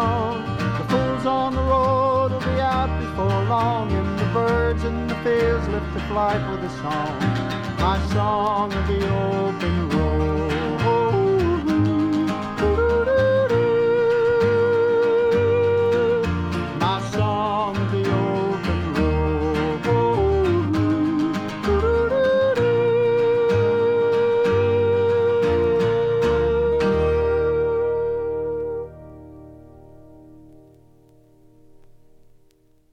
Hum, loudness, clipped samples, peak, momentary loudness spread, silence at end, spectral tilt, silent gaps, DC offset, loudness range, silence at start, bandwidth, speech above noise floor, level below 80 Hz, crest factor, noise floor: none; -21 LUFS; under 0.1%; -6 dBFS; 6 LU; 2.55 s; -7.5 dB/octave; none; under 0.1%; 4 LU; 0 s; 9.4 kHz; 35 dB; -34 dBFS; 14 dB; -56 dBFS